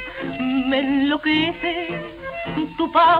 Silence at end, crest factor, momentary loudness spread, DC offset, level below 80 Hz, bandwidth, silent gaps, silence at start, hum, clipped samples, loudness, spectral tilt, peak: 0 s; 14 dB; 10 LU; under 0.1%; -48 dBFS; 5.2 kHz; none; 0 s; none; under 0.1%; -22 LUFS; -7 dB/octave; -6 dBFS